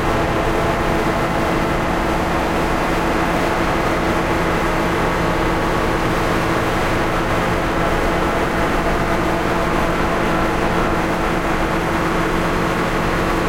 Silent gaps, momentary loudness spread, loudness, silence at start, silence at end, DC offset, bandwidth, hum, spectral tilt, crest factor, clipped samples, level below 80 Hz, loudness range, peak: none; 1 LU; -18 LUFS; 0 s; 0 s; 0.9%; 17 kHz; none; -5.5 dB/octave; 14 dB; under 0.1%; -26 dBFS; 0 LU; -4 dBFS